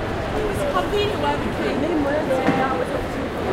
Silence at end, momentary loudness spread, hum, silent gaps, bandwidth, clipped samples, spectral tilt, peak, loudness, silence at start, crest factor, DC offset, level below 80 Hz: 0 s; 5 LU; none; none; 16 kHz; under 0.1%; -6 dB/octave; -6 dBFS; -22 LUFS; 0 s; 16 dB; under 0.1%; -36 dBFS